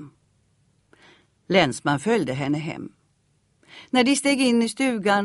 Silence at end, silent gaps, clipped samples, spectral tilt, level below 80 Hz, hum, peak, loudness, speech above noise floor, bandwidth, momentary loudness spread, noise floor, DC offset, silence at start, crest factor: 0 s; none; under 0.1%; -4.5 dB/octave; -60 dBFS; none; -4 dBFS; -22 LUFS; 44 dB; 11.5 kHz; 9 LU; -66 dBFS; under 0.1%; 0 s; 20 dB